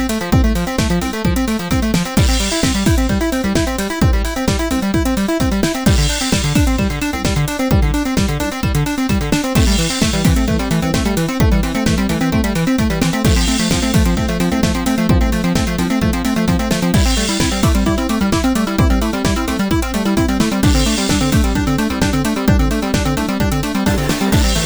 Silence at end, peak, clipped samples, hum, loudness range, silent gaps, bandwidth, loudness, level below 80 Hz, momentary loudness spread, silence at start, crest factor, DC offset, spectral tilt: 0 s; -2 dBFS; under 0.1%; none; 1 LU; none; over 20 kHz; -16 LUFS; -22 dBFS; 3 LU; 0 s; 12 dB; under 0.1%; -5 dB/octave